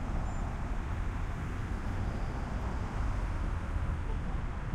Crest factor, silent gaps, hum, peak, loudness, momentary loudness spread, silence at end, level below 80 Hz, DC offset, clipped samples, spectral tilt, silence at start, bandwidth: 12 dB; none; none; -22 dBFS; -37 LUFS; 2 LU; 0 s; -36 dBFS; under 0.1%; under 0.1%; -7 dB/octave; 0 s; 10.5 kHz